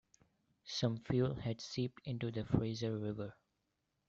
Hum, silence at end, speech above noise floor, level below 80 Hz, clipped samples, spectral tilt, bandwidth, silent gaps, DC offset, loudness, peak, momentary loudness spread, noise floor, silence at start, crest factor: none; 0.75 s; 46 dB; -62 dBFS; under 0.1%; -6.5 dB/octave; 7.8 kHz; none; under 0.1%; -39 LUFS; -18 dBFS; 8 LU; -84 dBFS; 0.65 s; 22 dB